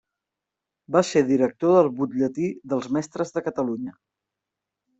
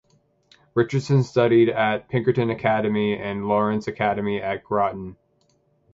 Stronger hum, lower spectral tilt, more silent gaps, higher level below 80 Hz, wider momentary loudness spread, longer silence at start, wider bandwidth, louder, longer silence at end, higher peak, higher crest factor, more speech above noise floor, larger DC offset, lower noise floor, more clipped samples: neither; about the same, -6.5 dB/octave vs -7.5 dB/octave; neither; second, -66 dBFS vs -56 dBFS; about the same, 10 LU vs 8 LU; first, 0.9 s vs 0.75 s; about the same, 8.2 kHz vs 7.8 kHz; about the same, -23 LUFS vs -22 LUFS; first, 1.1 s vs 0.8 s; about the same, -6 dBFS vs -4 dBFS; about the same, 20 dB vs 18 dB; first, 63 dB vs 43 dB; neither; first, -86 dBFS vs -65 dBFS; neither